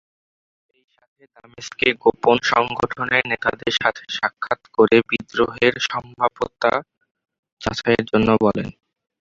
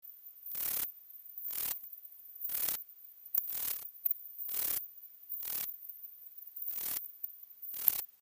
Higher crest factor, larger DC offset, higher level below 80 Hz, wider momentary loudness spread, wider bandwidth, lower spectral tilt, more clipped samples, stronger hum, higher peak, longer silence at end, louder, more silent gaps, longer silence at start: second, 20 dB vs 34 dB; neither; first, -50 dBFS vs -76 dBFS; second, 10 LU vs 15 LU; second, 7.6 kHz vs 16 kHz; first, -5 dB/octave vs 0.5 dB/octave; neither; neither; first, -2 dBFS vs -6 dBFS; first, 0.5 s vs 0.1 s; first, -20 LUFS vs -35 LUFS; first, 7.11-7.15 s, 7.39-7.43 s, 7.52-7.57 s vs none; first, 1.6 s vs 0.05 s